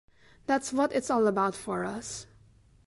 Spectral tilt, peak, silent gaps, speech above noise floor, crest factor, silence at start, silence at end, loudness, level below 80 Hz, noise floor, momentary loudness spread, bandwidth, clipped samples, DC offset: -4.5 dB/octave; -14 dBFS; none; 31 dB; 16 dB; 0.5 s; 0.6 s; -29 LUFS; -62 dBFS; -59 dBFS; 13 LU; 11.5 kHz; under 0.1%; under 0.1%